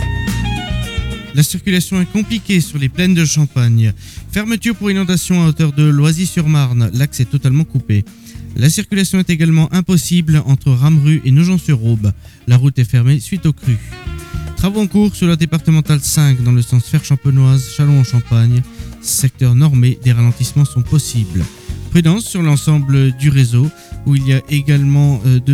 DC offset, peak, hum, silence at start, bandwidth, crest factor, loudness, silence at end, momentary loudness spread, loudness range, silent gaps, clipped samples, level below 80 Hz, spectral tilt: under 0.1%; -2 dBFS; none; 0 s; 16 kHz; 10 dB; -13 LUFS; 0 s; 8 LU; 2 LU; none; under 0.1%; -32 dBFS; -6 dB/octave